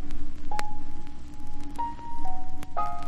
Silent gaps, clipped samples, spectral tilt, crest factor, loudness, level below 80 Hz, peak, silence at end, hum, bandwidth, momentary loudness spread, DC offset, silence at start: none; under 0.1%; -5.5 dB/octave; 16 dB; -38 LUFS; -32 dBFS; -6 dBFS; 0 s; none; 5.4 kHz; 11 LU; under 0.1%; 0 s